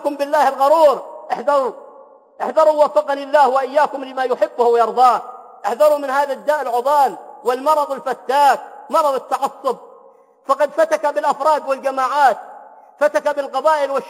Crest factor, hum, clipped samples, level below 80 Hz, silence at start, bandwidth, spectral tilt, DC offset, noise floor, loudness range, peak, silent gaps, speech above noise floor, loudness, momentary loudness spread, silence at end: 16 dB; none; under 0.1%; -72 dBFS; 0 s; 16.5 kHz; -2.5 dB/octave; under 0.1%; -48 dBFS; 3 LU; -2 dBFS; none; 32 dB; -17 LUFS; 11 LU; 0 s